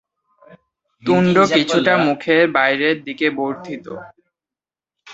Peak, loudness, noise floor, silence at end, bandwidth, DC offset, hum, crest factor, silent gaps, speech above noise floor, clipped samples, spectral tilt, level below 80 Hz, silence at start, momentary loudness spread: -2 dBFS; -16 LUFS; under -90 dBFS; 0 s; 8 kHz; under 0.1%; none; 18 dB; none; over 73 dB; under 0.1%; -5.5 dB/octave; -60 dBFS; 0.5 s; 16 LU